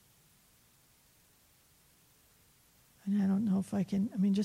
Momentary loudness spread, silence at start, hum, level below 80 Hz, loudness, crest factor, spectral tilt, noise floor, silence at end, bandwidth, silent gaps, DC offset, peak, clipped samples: 5 LU; 3.05 s; none; -74 dBFS; -33 LUFS; 14 dB; -8 dB/octave; -66 dBFS; 0 s; 15 kHz; none; under 0.1%; -22 dBFS; under 0.1%